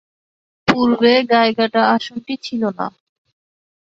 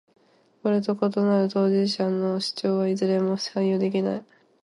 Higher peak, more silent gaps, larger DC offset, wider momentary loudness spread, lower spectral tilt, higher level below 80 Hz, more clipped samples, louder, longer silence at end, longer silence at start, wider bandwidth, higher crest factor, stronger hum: first, -2 dBFS vs -8 dBFS; neither; neither; first, 13 LU vs 4 LU; about the same, -5.5 dB/octave vs -6.5 dB/octave; first, -58 dBFS vs -72 dBFS; neither; first, -16 LUFS vs -24 LUFS; first, 1.05 s vs 0.4 s; about the same, 0.65 s vs 0.65 s; second, 7.6 kHz vs 11.5 kHz; about the same, 16 dB vs 16 dB; neither